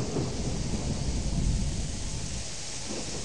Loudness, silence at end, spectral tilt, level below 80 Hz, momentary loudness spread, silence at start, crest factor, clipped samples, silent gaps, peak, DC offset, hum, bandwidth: -32 LUFS; 0 s; -4.5 dB/octave; -34 dBFS; 5 LU; 0 s; 14 dB; under 0.1%; none; -16 dBFS; 1%; none; 11.5 kHz